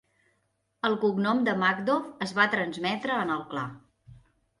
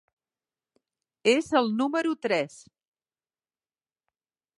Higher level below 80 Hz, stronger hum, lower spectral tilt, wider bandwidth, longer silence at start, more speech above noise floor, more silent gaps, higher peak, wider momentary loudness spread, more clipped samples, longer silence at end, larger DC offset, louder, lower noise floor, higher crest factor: first, -68 dBFS vs -74 dBFS; neither; first, -5.5 dB/octave vs -4 dB/octave; about the same, 11.5 kHz vs 11.5 kHz; second, 0.85 s vs 1.25 s; second, 47 dB vs over 65 dB; neither; about the same, -8 dBFS vs -8 dBFS; first, 8 LU vs 5 LU; neither; second, 0.45 s vs 2.1 s; neither; about the same, -27 LUFS vs -26 LUFS; second, -74 dBFS vs under -90 dBFS; about the same, 20 dB vs 22 dB